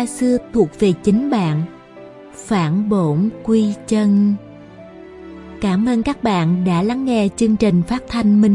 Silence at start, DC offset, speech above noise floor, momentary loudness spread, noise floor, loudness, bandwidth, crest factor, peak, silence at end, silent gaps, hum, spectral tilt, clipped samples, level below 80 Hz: 0 s; under 0.1%; 23 dB; 13 LU; -39 dBFS; -17 LUFS; 11.5 kHz; 14 dB; -2 dBFS; 0 s; none; none; -7 dB/octave; under 0.1%; -44 dBFS